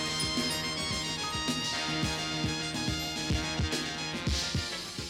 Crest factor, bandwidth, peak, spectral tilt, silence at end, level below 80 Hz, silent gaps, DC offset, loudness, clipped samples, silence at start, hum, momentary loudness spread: 14 dB; 16 kHz; -18 dBFS; -3 dB/octave; 0 s; -44 dBFS; none; under 0.1%; -31 LUFS; under 0.1%; 0 s; none; 3 LU